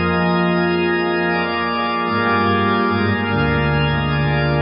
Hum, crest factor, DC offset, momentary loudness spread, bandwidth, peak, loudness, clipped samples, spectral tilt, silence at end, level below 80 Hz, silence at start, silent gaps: none; 12 dB; under 0.1%; 2 LU; 5.6 kHz; -4 dBFS; -17 LUFS; under 0.1%; -11.5 dB/octave; 0 s; -34 dBFS; 0 s; none